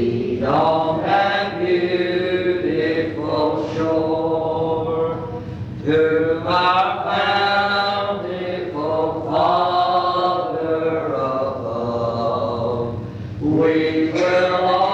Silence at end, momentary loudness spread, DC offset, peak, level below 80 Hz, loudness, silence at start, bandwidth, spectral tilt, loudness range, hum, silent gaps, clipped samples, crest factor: 0 s; 7 LU; under 0.1%; -6 dBFS; -50 dBFS; -20 LUFS; 0 s; 8 kHz; -7 dB/octave; 3 LU; none; none; under 0.1%; 14 dB